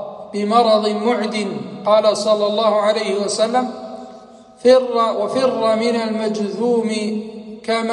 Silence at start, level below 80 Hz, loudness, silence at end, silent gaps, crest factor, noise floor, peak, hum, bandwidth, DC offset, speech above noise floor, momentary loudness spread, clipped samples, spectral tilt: 0 s; -66 dBFS; -18 LUFS; 0 s; none; 16 dB; -41 dBFS; -2 dBFS; none; 11.5 kHz; under 0.1%; 24 dB; 13 LU; under 0.1%; -4.5 dB/octave